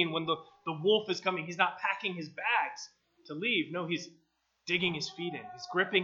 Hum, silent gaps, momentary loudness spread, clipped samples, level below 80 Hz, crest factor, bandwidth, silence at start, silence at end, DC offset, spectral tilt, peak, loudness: none; none; 13 LU; under 0.1%; -80 dBFS; 24 dB; 7.6 kHz; 0 s; 0 s; under 0.1%; -4 dB/octave; -10 dBFS; -32 LUFS